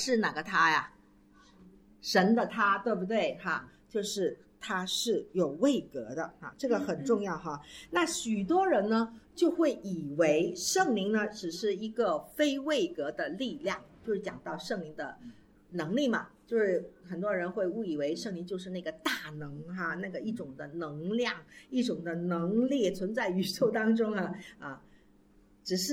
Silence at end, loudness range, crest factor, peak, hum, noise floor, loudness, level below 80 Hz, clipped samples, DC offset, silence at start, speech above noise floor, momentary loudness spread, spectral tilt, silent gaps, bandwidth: 0 s; 6 LU; 20 dB; -12 dBFS; none; -62 dBFS; -31 LUFS; -66 dBFS; under 0.1%; under 0.1%; 0 s; 31 dB; 13 LU; -4.5 dB/octave; none; 17 kHz